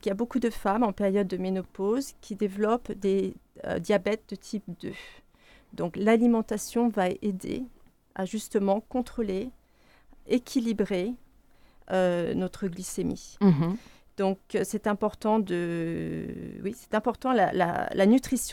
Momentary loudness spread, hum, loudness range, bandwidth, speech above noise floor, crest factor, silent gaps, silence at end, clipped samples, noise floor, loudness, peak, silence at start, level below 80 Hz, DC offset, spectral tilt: 13 LU; none; 3 LU; 17 kHz; 32 dB; 18 dB; none; 0 s; under 0.1%; -60 dBFS; -28 LUFS; -10 dBFS; 0.05 s; -54 dBFS; under 0.1%; -6 dB/octave